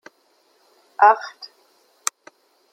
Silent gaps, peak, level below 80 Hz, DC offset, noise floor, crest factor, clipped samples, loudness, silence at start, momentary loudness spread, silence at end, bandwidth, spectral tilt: none; -2 dBFS; -88 dBFS; under 0.1%; -62 dBFS; 22 dB; under 0.1%; -19 LUFS; 1 s; 25 LU; 1.45 s; 16 kHz; 1 dB/octave